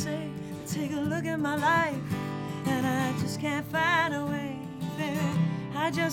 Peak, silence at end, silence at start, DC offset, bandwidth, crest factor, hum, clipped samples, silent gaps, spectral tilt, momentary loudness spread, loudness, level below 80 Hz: -12 dBFS; 0 s; 0 s; under 0.1%; 17.5 kHz; 16 dB; none; under 0.1%; none; -5.5 dB/octave; 10 LU; -29 LUFS; -60 dBFS